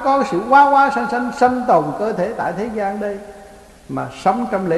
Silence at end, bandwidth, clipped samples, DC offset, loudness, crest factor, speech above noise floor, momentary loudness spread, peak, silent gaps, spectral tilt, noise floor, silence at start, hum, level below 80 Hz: 0 s; 12.5 kHz; under 0.1%; under 0.1%; -17 LUFS; 16 dB; 25 dB; 14 LU; -2 dBFS; none; -6 dB/octave; -41 dBFS; 0 s; none; -50 dBFS